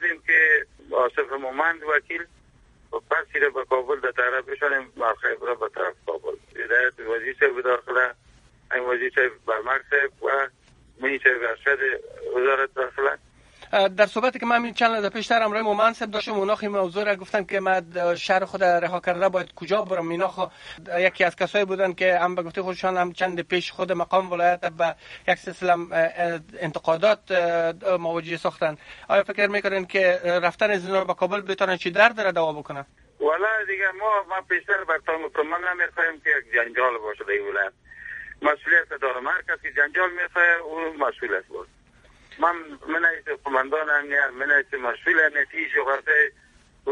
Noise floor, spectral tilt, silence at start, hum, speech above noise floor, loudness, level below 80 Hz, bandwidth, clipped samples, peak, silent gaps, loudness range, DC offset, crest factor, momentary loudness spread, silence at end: -56 dBFS; -4.5 dB/octave; 0 s; none; 32 dB; -23 LUFS; -62 dBFS; 11 kHz; under 0.1%; -2 dBFS; none; 3 LU; under 0.1%; 22 dB; 9 LU; 0 s